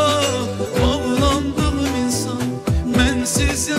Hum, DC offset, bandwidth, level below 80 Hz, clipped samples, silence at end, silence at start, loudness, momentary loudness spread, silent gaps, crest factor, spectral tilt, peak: none; under 0.1%; 16 kHz; -28 dBFS; under 0.1%; 0 s; 0 s; -19 LUFS; 5 LU; none; 14 dB; -4.5 dB/octave; -6 dBFS